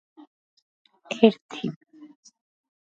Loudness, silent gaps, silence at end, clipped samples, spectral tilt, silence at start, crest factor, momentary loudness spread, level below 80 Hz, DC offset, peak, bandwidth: -24 LUFS; 1.41-1.49 s; 1.15 s; under 0.1%; -6 dB/octave; 1.1 s; 28 dB; 17 LU; -80 dBFS; under 0.1%; -2 dBFS; 7.6 kHz